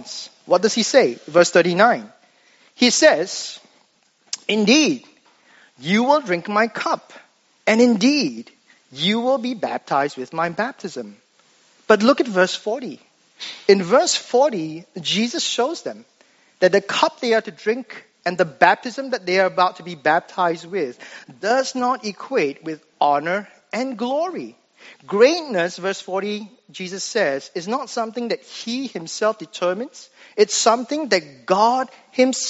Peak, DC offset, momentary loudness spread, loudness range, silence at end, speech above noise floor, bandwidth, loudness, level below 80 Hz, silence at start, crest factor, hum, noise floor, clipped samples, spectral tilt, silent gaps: 0 dBFS; under 0.1%; 15 LU; 5 LU; 0 s; 41 dB; 8 kHz; -20 LUFS; -74 dBFS; 0 s; 20 dB; none; -60 dBFS; under 0.1%; -2.5 dB/octave; none